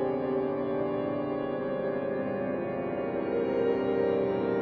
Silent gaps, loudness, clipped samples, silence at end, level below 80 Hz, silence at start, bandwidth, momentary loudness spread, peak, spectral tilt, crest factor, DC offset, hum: none; -30 LUFS; under 0.1%; 0 s; -62 dBFS; 0 s; 5.2 kHz; 4 LU; -16 dBFS; -6.5 dB/octave; 14 dB; under 0.1%; none